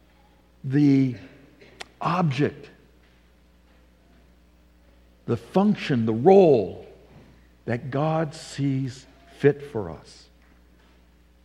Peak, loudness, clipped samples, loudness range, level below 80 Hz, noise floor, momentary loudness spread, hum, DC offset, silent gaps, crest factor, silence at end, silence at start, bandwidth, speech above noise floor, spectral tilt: -4 dBFS; -23 LUFS; under 0.1%; 9 LU; -58 dBFS; -57 dBFS; 24 LU; none; under 0.1%; none; 22 dB; 1.45 s; 0.65 s; 11 kHz; 35 dB; -8 dB/octave